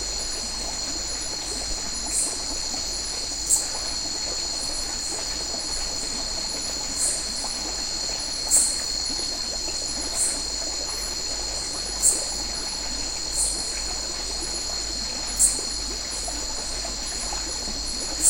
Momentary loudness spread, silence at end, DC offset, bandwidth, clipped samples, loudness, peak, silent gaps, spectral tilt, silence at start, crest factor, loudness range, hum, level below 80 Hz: 8 LU; 0 s; under 0.1%; 16 kHz; under 0.1%; -24 LUFS; -4 dBFS; none; 0 dB/octave; 0 s; 24 dB; 2 LU; none; -40 dBFS